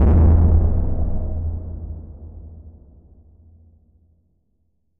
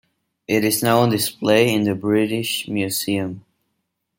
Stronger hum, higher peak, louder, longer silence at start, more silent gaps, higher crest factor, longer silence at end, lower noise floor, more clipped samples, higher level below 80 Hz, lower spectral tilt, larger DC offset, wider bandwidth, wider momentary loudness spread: neither; about the same, -4 dBFS vs -2 dBFS; about the same, -19 LUFS vs -19 LUFS; second, 0 s vs 0.5 s; neither; about the same, 16 dB vs 18 dB; first, 2.3 s vs 0.8 s; second, -69 dBFS vs -75 dBFS; neither; first, -22 dBFS vs -62 dBFS; first, -13 dB/octave vs -4.5 dB/octave; neither; second, 2.3 kHz vs 17 kHz; first, 25 LU vs 8 LU